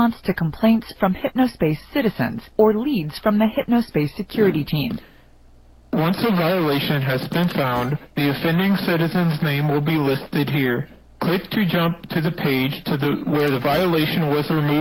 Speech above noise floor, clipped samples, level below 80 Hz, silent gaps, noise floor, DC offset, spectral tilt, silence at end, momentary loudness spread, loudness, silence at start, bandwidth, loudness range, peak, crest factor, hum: 28 dB; under 0.1%; -48 dBFS; none; -48 dBFS; under 0.1%; -7.5 dB/octave; 0 s; 5 LU; -20 LUFS; 0 s; 16.5 kHz; 2 LU; -4 dBFS; 16 dB; none